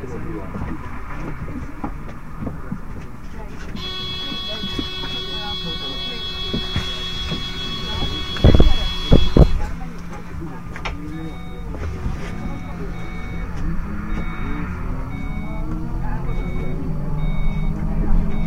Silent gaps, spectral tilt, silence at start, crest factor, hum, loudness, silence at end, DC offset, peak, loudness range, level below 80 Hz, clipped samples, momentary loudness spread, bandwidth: none; -6.5 dB/octave; 0 s; 20 dB; none; -24 LUFS; 0 s; 2%; 0 dBFS; 11 LU; -24 dBFS; under 0.1%; 15 LU; 8.2 kHz